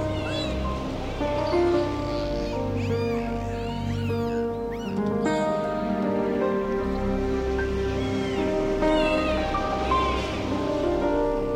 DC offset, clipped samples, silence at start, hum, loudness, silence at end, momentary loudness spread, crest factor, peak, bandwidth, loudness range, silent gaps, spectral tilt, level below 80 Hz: under 0.1%; under 0.1%; 0 s; none; -26 LUFS; 0 s; 6 LU; 14 dB; -10 dBFS; 16 kHz; 2 LU; none; -6.5 dB/octave; -36 dBFS